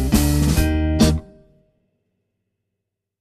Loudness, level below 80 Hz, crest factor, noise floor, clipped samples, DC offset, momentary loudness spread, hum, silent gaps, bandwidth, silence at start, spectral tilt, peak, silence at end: -18 LUFS; -26 dBFS; 16 dB; -80 dBFS; under 0.1%; under 0.1%; 3 LU; none; none; 14 kHz; 0 s; -5.5 dB/octave; -4 dBFS; 1.95 s